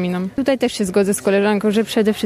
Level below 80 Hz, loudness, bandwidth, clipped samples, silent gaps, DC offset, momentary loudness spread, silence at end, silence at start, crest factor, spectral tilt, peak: -52 dBFS; -18 LUFS; 14.5 kHz; under 0.1%; none; under 0.1%; 4 LU; 0 s; 0 s; 12 dB; -5 dB/octave; -4 dBFS